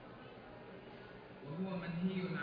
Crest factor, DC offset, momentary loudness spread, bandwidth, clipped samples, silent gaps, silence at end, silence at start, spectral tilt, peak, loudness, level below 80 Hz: 16 dB; under 0.1%; 15 LU; 5.2 kHz; under 0.1%; none; 0 s; 0 s; -6 dB/octave; -28 dBFS; -45 LUFS; -70 dBFS